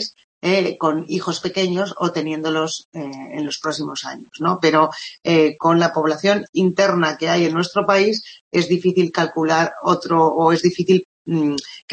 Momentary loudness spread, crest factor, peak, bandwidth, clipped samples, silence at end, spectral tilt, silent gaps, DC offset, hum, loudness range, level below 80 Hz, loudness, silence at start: 10 LU; 16 dB; -2 dBFS; 8.8 kHz; under 0.1%; 0.15 s; -5 dB/octave; 0.24-0.41 s, 2.85-2.92 s, 6.49-6.53 s, 8.41-8.51 s, 11.05-11.25 s; under 0.1%; none; 5 LU; -66 dBFS; -19 LUFS; 0 s